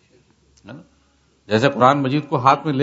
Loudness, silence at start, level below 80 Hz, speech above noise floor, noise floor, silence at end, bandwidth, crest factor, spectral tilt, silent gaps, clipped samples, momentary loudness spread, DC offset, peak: -17 LUFS; 0.65 s; -60 dBFS; 42 dB; -59 dBFS; 0 s; 8 kHz; 20 dB; -6.5 dB/octave; none; under 0.1%; 6 LU; under 0.1%; 0 dBFS